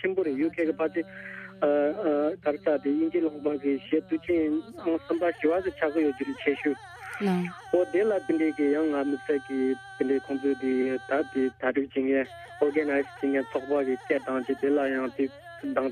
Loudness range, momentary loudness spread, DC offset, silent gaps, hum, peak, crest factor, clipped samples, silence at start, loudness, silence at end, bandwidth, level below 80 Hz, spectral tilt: 1 LU; 5 LU; under 0.1%; none; none; -10 dBFS; 18 dB; under 0.1%; 0 s; -28 LUFS; 0 s; 10 kHz; -66 dBFS; -7 dB/octave